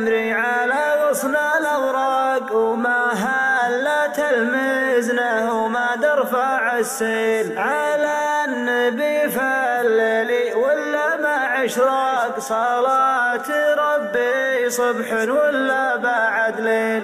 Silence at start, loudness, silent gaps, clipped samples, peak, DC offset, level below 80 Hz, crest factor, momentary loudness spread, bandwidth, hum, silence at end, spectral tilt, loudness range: 0 s; -19 LUFS; none; under 0.1%; -6 dBFS; under 0.1%; -70 dBFS; 12 dB; 3 LU; 16 kHz; none; 0 s; -3 dB/octave; 1 LU